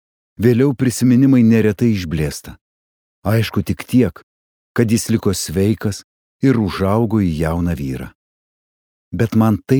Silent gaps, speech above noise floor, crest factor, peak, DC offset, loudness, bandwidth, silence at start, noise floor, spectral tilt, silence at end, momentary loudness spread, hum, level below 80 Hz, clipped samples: 2.61-3.22 s, 4.23-4.75 s, 6.04-6.40 s, 8.15-9.11 s; over 75 dB; 16 dB; -2 dBFS; under 0.1%; -17 LUFS; over 20 kHz; 0.4 s; under -90 dBFS; -6.5 dB/octave; 0 s; 12 LU; none; -40 dBFS; under 0.1%